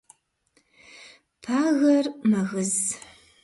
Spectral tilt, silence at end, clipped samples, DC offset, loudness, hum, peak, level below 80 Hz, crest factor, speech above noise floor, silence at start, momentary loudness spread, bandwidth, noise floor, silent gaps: -4.5 dB/octave; 0.45 s; under 0.1%; under 0.1%; -23 LUFS; none; -10 dBFS; -68 dBFS; 16 dB; 45 dB; 1 s; 10 LU; 11.5 kHz; -68 dBFS; none